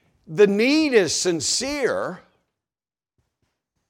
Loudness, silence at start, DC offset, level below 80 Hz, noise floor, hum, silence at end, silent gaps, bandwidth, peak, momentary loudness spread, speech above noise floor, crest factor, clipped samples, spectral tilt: -20 LUFS; 0.3 s; under 0.1%; -60 dBFS; under -90 dBFS; none; 1.7 s; none; 15.5 kHz; -4 dBFS; 11 LU; over 70 dB; 20 dB; under 0.1%; -3 dB/octave